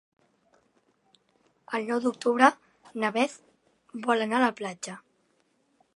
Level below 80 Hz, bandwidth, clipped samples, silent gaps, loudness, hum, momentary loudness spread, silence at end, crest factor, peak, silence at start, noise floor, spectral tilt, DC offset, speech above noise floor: -84 dBFS; 11.5 kHz; under 0.1%; none; -27 LUFS; none; 20 LU; 0.95 s; 26 dB; -2 dBFS; 1.7 s; -70 dBFS; -4 dB/octave; under 0.1%; 44 dB